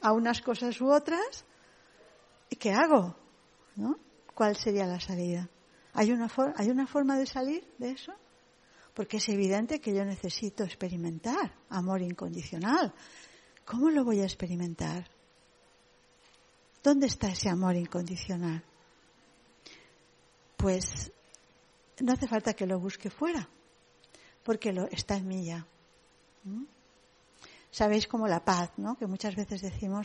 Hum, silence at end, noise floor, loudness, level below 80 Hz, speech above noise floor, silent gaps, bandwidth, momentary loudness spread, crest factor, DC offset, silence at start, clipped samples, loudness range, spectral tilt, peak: none; 0 s; -64 dBFS; -31 LUFS; -56 dBFS; 33 dB; none; 10.5 kHz; 15 LU; 24 dB; under 0.1%; 0 s; under 0.1%; 7 LU; -5.5 dB/octave; -8 dBFS